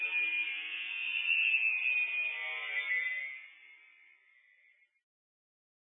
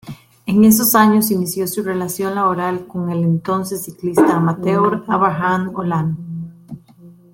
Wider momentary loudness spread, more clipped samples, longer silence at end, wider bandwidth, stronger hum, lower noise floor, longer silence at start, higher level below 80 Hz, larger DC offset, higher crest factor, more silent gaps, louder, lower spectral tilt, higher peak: second, 10 LU vs 16 LU; neither; first, 2.2 s vs 0.2 s; second, 3.8 kHz vs 17 kHz; neither; first, -68 dBFS vs -44 dBFS; about the same, 0 s vs 0.05 s; second, under -90 dBFS vs -54 dBFS; neither; about the same, 16 dB vs 16 dB; neither; second, -31 LUFS vs -16 LUFS; second, 14 dB/octave vs -5.5 dB/octave; second, -20 dBFS vs 0 dBFS